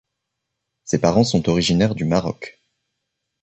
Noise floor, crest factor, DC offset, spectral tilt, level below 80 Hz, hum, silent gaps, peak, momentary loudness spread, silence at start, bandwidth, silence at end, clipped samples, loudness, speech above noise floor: -79 dBFS; 18 dB; under 0.1%; -5.5 dB/octave; -46 dBFS; none; none; -4 dBFS; 17 LU; 0.85 s; 8.4 kHz; 0.9 s; under 0.1%; -19 LUFS; 61 dB